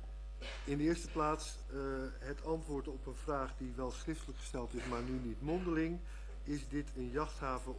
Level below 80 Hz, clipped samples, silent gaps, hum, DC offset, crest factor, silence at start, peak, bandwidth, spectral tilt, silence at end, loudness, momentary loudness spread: -46 dBFS; under 0.1%; none; none; under 0.1%; 18 dB; 0 s; -22 dBFS; 11 kHz; -6 dB/octave; 0 s; -41 LUFS; 9 LU